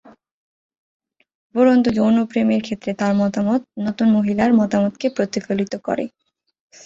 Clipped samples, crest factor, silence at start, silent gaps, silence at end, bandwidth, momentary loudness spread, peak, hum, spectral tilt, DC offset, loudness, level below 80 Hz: under 0.1%; 16 dB; 1.55 s; none; 0.75 s; 7.6 kHz; 9 LU; -4 dBFS; none; -7 dB/octave; under 0.1%; -19 LUFS; -56 dBFS